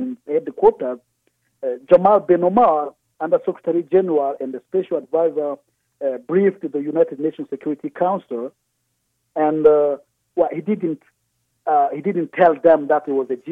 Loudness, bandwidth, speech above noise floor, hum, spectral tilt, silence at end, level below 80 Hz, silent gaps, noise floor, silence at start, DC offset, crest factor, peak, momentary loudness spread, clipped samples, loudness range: -19 LUFS; 3.9 kHz; 53 dB; none; -9.5 dB/octave; 0 s; -62 dBFS; none; -71 dBFS; 0 s; under 0.1%; 18 dB; 0 dBFS; 14 LU; under 0.1%; 5 LU